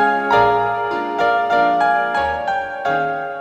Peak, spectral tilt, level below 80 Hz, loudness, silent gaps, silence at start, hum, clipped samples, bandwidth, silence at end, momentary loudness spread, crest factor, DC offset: -2 dBFS; -5.5 dB/octave; -48 dBFS; -17 LUFS; none; 0 s; none; under 0.1%; 8.4 kHz; 0 s; 7 LU; 16 dB; under 0.1%